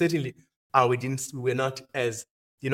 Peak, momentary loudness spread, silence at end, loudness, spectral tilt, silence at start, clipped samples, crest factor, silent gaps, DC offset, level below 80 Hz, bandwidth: -4 dBFS; 13 LU; 0 s; -27 LUFS; -5 dB/octave; 0 s; under 0.1%; 24 dB; 0.56-0.70 s, 2.30-2.58 s; under 0.1%; -68 dBFS; 16.5 kHz